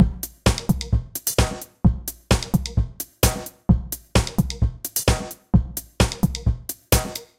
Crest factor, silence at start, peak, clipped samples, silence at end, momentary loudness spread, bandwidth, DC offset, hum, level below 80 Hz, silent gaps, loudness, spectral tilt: 20 dB; 0 s; -2 dBFS; under 0.1%; 0.15 s; 5 LU; 17 kHz; under 0.1%; none; -28 dBFS; none; -23 LUFS; -5 dB/octave